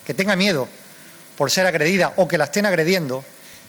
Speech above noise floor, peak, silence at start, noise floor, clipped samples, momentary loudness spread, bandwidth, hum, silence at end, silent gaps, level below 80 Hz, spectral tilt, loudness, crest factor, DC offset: 24 dB; -6 dBFS; 0.05 s; -43 dBFS; under 0.1%; 9 LU; over 20 kHz; none; 0.1 s; none; -62 dBFS; -4 dB/octave; -19 LUFS; 14 dB; under 0.1%